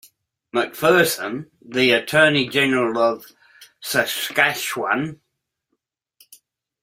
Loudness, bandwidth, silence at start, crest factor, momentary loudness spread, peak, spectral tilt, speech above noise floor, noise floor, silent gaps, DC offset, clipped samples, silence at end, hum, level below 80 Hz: -19 LUFS; 16 kHz; 0.55 s; 22 dB; 13 LU; 0 dBFS; -3.5 dB/octave; 58 dB; -78 dBFS; none; under 0.1%; under 0.1%; 1.7 s; none; -62 dBFS